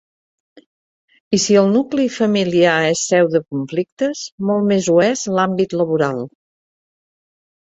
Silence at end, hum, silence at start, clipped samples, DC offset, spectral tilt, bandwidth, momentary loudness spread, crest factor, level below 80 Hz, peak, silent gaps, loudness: 1.5 s; none; 1.3 s; under 0.1%; under 0.1%; -4.5 dB/octave; 8.2 kHz; 8 LU; 16 dB; -60 dBFS; -2 dBFS; 3.92-3.97 s, 4.32-4.38 s; -17 LUFS